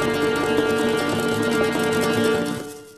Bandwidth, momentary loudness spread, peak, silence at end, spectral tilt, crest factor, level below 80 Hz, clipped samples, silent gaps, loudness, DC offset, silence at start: 14 kHz; 3 LU; -6 dBFS; 0.05 s; -4.5 dB/octave; 16 dB; -50 dBFS; under 0.1%; none; -21 LUFS; under 0.1%; 0 s